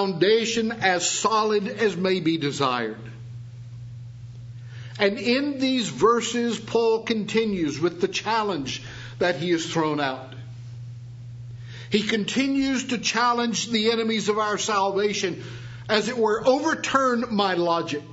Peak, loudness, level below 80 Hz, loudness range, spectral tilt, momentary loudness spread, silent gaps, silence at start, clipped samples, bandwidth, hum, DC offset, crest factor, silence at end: -4 dBFS; -23 LUFS; -58 dBFS; 5 LU; -4 dB/octave; 18 LU; none; 0 s; under 0.1%; 8 kHz; none; under 0.1%; 20 dB; 0 s